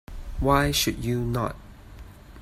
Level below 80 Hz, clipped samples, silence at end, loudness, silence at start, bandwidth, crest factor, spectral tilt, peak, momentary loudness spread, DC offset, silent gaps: -36 dBFS; under 0.1%; 0 s; -25 LUFS; 0.1 s; 16 kHz; 20 dB; -4.5 dB/octave; -6 dBFS; 15 LU; under 0.1%; none